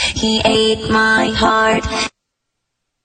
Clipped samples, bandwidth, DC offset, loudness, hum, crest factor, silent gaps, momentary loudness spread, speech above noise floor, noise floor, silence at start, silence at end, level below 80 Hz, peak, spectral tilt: under 0.1%; 10 kHz; under 0.1%; -14 LUFS; none; 16 dB; none; 7 LU; 60 dB; -75 dBFS; 0 s; 0.95 s; -34 dBFS; 0 dBFS; -3.5 dB/octave